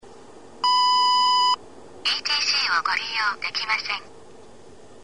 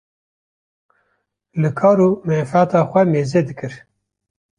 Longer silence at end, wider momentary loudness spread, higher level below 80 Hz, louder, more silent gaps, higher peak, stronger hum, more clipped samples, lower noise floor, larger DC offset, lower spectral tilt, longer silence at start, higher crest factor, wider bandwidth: about the same, 0.85 s vs 0.8 s; second, 9 LU vs 14 LU; second, -64 dBFS vs -58 dBFS; second, -21 LUFS vs -16 LUFS; neither; second, -10 dBFS vs -2 dBFS; neither; neither; second, -48 dBFS vs -70 dBFS; first, 0.5% vs under 0.1%; second, 1 dB/octave vs -8.5 dB/octave; second, 0.05 s vs 1.55 s; about the same, 14 dB vs 16 dB; about the same, 10.5 kHz vs 10 kHz